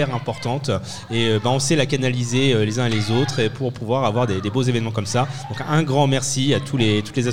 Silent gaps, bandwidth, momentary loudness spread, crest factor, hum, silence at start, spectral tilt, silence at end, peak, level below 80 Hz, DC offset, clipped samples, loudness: none; 14.5 kHz; 7 LU; 14 dB; none; 0 s; -5 dB/octave; 0 s; -4 dBFS; -52 dBFS; 1%; under 0.1%; -20 LUFS